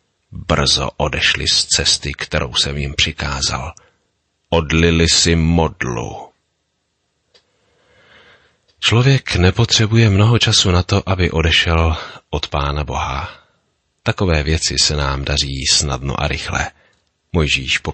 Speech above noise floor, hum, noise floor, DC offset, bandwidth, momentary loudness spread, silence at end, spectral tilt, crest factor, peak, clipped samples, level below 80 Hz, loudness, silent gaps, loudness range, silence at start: 53 dB; none; -69 dBFS; under 0.1%; 8.8 kHz; 11 LU; 0 s; -3.5 dB/octave; 16 dB; -2 dBFS; under 0.1%; -28 dBFS; -15 LUFS; none; 6 LU; 0.3 s